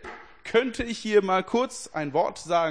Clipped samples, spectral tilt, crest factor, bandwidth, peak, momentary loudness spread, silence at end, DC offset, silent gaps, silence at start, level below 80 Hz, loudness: under 0.1%; -4.5 dB/octave; 18 dB; 10.5 kHz; -8 dBFS; 9 LU; 0 s; 0.2%; none; 0 s; -54 dBFS; -26 LUFS